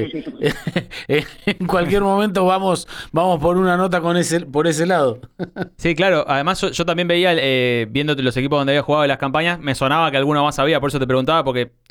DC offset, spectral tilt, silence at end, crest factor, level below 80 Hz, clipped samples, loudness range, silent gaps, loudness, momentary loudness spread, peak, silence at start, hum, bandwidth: under 0.1%; -5 dB/octave; 0.2 s; 12 dB; -42 dBFS; under 0.1%; 1 LU; none; -18 LUFS; 7 LU; -6 dBFS; 0 s; none; 18 kHz